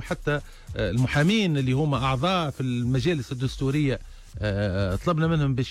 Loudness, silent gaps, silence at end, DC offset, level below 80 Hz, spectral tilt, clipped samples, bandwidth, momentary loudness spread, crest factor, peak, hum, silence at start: -25 LUFS; none; 0 s; under 0.1%; -40 dBFS; -6.5 dB/octave; under 0.1%; 13 kHz; 8 LU; 12 dB; -12 dBFS; none; 0 s